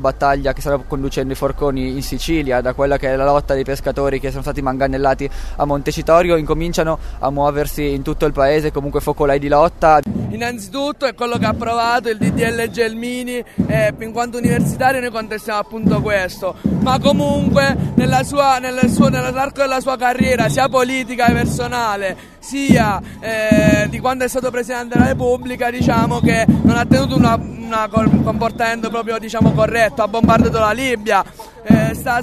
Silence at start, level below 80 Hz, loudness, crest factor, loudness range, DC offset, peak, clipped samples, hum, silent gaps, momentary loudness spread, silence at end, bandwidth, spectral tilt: 0 s; -30 dBFS; -16 LUFS; 16 dB; 3 LU; under 0.1%; 0 dBFS; under 0.1%; none; none; 9 LU; 0 s; 13.5 kHz; -6 dB/octave